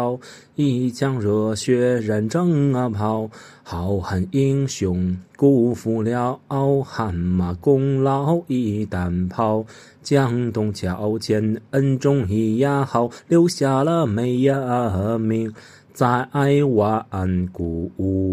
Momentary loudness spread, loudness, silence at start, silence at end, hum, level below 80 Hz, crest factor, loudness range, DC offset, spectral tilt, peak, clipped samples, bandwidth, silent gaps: 7 LU; -21 LUFS; 0 s; 0 s; none; -54 dBFS; 16 dB; 2 LU; under 0.1%; -7.5 dB/octave; -4 dBFS; under 0.1%; 14 kHz; none